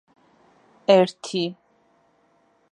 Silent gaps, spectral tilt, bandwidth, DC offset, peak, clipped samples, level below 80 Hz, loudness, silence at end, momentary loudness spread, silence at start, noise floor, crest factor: none; -5.5 dB/octave; 11 kHz; under 0.1%; -4 dBFS; under 0.1%; -78 dBFS; -21 LUFS; 1.2 s; 11 LU; 0.9 s; -63 dBFS; 22 dB